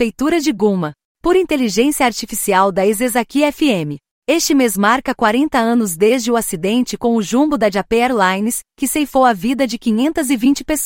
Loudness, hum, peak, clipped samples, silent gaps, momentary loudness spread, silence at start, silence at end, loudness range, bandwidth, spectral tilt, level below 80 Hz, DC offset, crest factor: -15 LUFS; none; -2 dBFS; under 0.1%; 1.05-1.15 s, 4.11-4.22 s; 5 LU; 0 s; 0 s; 1 LU; 16.5 kHz; -4 dB/octave; -44 dBFS; under 0.1%; 14 dB